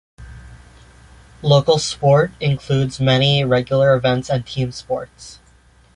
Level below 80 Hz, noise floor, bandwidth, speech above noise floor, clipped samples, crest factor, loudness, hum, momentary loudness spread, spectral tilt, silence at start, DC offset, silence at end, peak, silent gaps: -44 dBFS; -51 dBFS; 11 kHz; 34 dB; under 0.1%; 16 dB; -17 LUFS; none; 12 LU; -5.5 dB/octave; 0.2 s; under 0.1%; 0.65 s; -2 dBFS; none